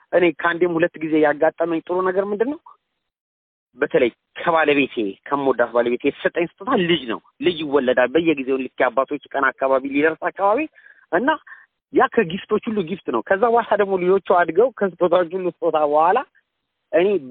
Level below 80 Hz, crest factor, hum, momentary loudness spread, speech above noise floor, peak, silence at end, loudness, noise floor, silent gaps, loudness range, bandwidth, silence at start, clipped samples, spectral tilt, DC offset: -62 dBFS; 18 dB; none; 7 LU; 57 dB; -2 dBFS; 0 s; -20 LUFS; -76 dBFS; 3.20-3.67 s; 3 LU; 4.3 kHz; 0.1 s; under 0.1%; -10 dB/octave; under 0.1%